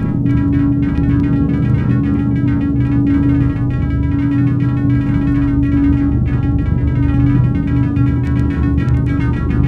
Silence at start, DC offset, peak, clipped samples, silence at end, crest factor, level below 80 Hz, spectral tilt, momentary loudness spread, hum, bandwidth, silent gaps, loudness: 0 s; under 0.1%; 0 dBFS; under 0.1%; 0 s; 12 dB; -22 dBFS; -10.5 dB/octave; 3 LU; none; 4.5 kHz; none; -15 LUFS